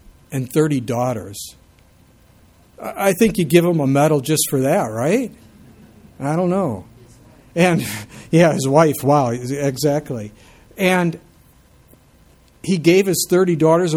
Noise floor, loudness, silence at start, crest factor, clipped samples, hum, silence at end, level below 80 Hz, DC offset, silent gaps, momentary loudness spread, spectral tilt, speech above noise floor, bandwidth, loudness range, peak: -51 dBFS; -17 LUFS; 0.3 s; 18 dB; under 0.1%; none; 0 s; -52 dBFS; under 0.1%; none; 15 LU; -5.5 dB/octave; 34 dB; 18.5 kHz; 5 LU; 0 dBFS